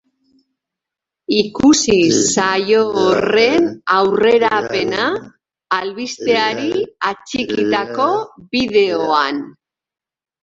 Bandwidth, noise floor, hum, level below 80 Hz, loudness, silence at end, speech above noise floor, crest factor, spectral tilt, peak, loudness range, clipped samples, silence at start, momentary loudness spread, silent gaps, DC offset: 8.2 kHz; -90 dBFS; none; -52 dBFS; -15 LUFS; 0.95 s; 74 dB; 16 dB; -3.5 dB/octave; -2 dBFS; 5 LU; under 0.1%; 1.3 s; 9 LU; none; under 0.1%